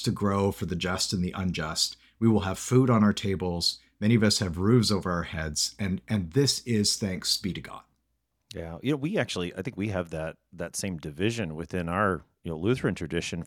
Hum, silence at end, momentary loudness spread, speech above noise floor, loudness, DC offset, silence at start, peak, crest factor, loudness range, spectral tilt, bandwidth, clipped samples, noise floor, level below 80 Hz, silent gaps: none; 0 s; 12 LU; 49 dB; -27 LUFS; under 0.1%; 0 s; -10 dBFS; 18 dB; 7 LU; -4.5 dB/octave; 18 kHz; under 0.1%; -77 dBFS; -52 dBFS; none